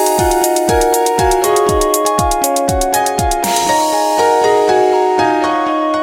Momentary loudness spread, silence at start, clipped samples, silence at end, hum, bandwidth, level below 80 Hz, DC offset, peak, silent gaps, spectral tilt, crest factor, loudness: 3 LU; 0 s; under 0.1%; 0 s; none; 17 kHz; -28 dBFS; under 0.1%; 0 dBFS; none; -3.5 dB/octave; 12 dB; -13 LUFS